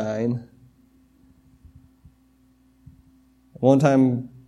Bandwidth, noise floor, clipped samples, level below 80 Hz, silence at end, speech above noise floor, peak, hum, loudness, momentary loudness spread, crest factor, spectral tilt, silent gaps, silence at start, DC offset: 10.5 kHz; -59 dBFS; under 0.1%; -60 dBFS; 0.2 s; 39 dB; -4 dBFS; none; -20 LUFS; 11 LU; 22 dB; -8 dB/octave; none; 0 s; under 0.1%